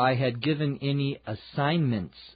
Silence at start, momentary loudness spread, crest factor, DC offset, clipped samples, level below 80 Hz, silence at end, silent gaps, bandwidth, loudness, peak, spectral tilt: 0 s; 8 LU; 16 dB; under 0.1%; under 0.1%; -58 dBFS; 0.05 s; none; 5 kHz; -28 LUFS; -12 dBFS; -11 dB/octave